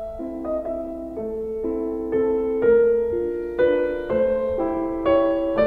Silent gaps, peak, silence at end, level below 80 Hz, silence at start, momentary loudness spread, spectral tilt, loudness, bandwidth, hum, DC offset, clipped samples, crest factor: none; -8 dBFS; 0 s; -44 dBFS; 0 s; 11 LU; -8.5 dB/octave; -23 LUFS; 4.8 kHz; none; under 0.1%; under 0.1%; 14 dB